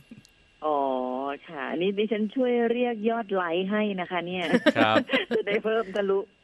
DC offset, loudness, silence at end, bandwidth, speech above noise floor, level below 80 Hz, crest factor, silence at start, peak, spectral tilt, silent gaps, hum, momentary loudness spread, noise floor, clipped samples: under 0.1%; -26 LUFS; 0.2 s; 13 kHz; 27 dB; -68 dBFS; 20 dB; 0.1 s; -6 dBFS; -6.5 dB/octave; none; none; 8 LU; -53 dBFS; under 0.1%